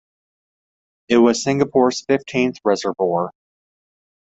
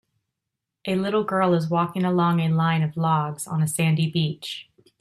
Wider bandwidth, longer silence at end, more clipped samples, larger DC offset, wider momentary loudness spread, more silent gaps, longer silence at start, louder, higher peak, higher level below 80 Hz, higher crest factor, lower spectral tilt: second, 8.2 kHz vs 13.5 kHz; first, 0.9 s vs 0.4 s; neither; neither; about the same, 6 LU vs 7 LU; neither; first, 1.1 s vs 0.85 s; first, -18 LUFS vs -23 LUFS; first, -2 dBFS vs -8 dBFS; about the same, -60 dBFS vs -64 dBFS; about the same, 18 dB vs 14 dB; about the same, -5 dB/octave vs -6 dB/octave